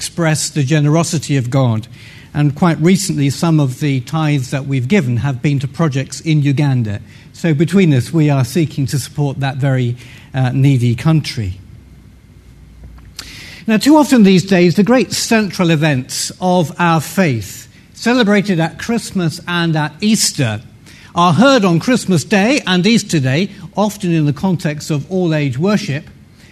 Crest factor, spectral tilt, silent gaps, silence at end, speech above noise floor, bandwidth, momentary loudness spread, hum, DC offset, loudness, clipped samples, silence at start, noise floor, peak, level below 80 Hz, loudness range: 14 dB; -5.5 dB/octave; none; 0.4 s; 27 dB; 13.5 kHz; 11 LU; none; under 0.1%; -14 LUFS; under 0.1%; 0 s; -41 dBFS; 0 dBFS; -46 dBFS; 4 LU